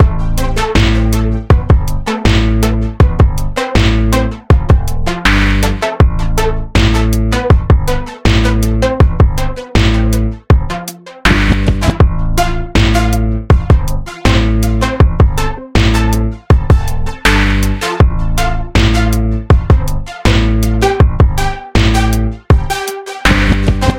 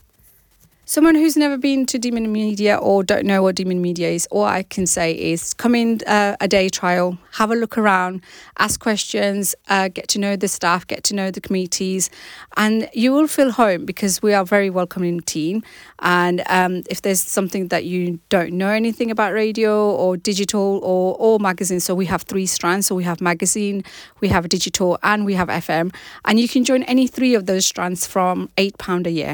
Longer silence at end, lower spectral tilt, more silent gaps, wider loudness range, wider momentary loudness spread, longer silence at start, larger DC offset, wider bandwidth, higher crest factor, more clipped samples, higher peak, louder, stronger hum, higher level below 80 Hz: about the same, 0 s vs 0 s; first, -6 dB/octave vs -4 dB/octave; neither; about the same, 1 LU vs 2 LU; about the same, 6 LU vs 6 LU; second, 0 s vs 0.9 s; first, 0.5% vs under 0.1%; second, 16.5 kHz vs 19.5 kHz; about the same, 10 dB vs 14 dB; first, 0.5% vs under 0.1%; first, 0 dBFS vs -4 dBFS; first, -13 LUFS vs -18 LUFS; neither; first, -14 dBFS vs -52 dBFS